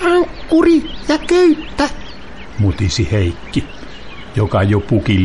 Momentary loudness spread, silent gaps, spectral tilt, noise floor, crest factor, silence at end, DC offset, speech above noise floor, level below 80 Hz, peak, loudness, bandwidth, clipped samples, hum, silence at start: 21 LU; none; -6.5 dB/octave; -33 dBFS; 12 dB; 0 s; 2%; 20 dB; -32 dBFS; -2 dBFS; -15 LUFS; 11.5 kHz; under 0.1%; none; 0 s